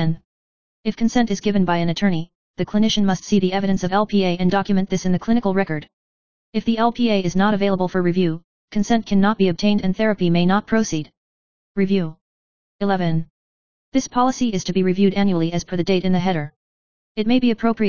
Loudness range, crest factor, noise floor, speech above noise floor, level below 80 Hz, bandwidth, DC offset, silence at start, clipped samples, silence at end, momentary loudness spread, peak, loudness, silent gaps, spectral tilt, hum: 3 LU; 16 dB; under -90 dBFS; over 71 dB; -48 dBFS; 7.2 kHz; 3%; 0 s; under 0.1%; 0 s; 10 LU; -4 dBFS; -20 LUFS; 0.25-0.83 s, 2.35-2.54 s, 5.93-6.53 s, 8.44-8.68 s, 11.17-11.75 s, 12.21-12.79 s, 13.30-13.92 s, 16.56-17.15 s; -6 dB/octave; none